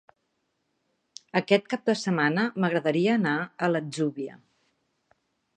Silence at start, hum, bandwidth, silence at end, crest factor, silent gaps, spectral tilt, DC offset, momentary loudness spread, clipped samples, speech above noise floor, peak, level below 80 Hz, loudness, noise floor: 1.35 s; none; 9.8 kHz; 1.25 s; 22 dB; none; -6 dB/octave; under 0.1%; 6 LU; under 0.1%; 51 dB; -6 dBFS; -76 dBFS; -26 LUFS; -76 dBFS